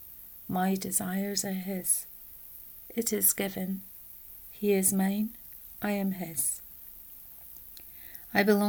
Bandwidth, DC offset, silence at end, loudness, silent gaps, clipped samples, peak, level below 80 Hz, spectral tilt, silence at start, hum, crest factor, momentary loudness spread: over 20 kHz; under 0.1%; 0 s; -29 LUFS; none; under 0.1%; -10 dBFS; -62 dBFS; -4 dB/octave; 0 s; none; 22 dB; 19 LU